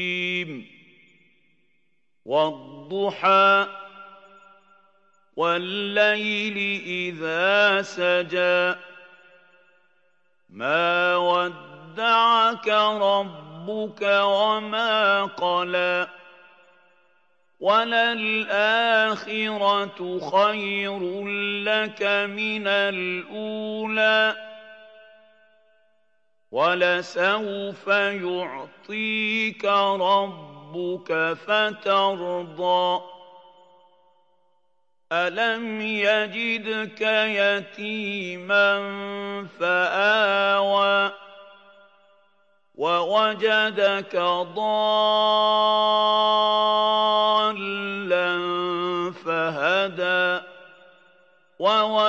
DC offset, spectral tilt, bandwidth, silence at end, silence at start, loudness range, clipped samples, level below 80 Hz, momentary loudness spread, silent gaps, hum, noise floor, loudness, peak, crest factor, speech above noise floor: under 0.1%; -4.5 dB/octave; 7.8 kHz; 0 s; 0 s; 5 LU; under 0.1%; -90 dBFS; 11 LU; none; none; -74 dBFS; -22 LUFS; -6 dBFS; 18 dB; 52 dB